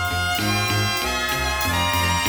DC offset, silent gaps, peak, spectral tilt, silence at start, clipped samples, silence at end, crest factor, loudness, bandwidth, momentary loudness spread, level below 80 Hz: under 0.1%; none; -6 dBFS; -3 dB/octave; 0 s; under 0.1%; 0 s; 14 dB; -21 LUFS; over 20 kHz; 2 LU; -36 dBFS